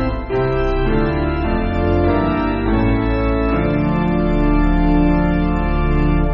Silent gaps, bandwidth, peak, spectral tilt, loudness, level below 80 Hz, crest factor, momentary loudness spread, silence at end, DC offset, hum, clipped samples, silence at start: none; 5.6 kHz; -2 dBFS; -7 dB/octave; -17 LUFS; -20 dBFS; 12 dB; 3 LU; 0 s; under 0.1%; none; under 0.1%; 0 s